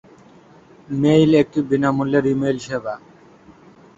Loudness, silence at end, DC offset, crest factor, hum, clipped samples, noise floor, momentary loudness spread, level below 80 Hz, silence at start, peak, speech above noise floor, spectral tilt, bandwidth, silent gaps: -18 LUFS; 1 s; under 0.1%; 18 dB; none; under 0.1%; -48 dBFS; 14 LU; -54 dBFS; 0.9 s; -2 dBFS; 30 dB; -7 dB/octave; 8 kHz; none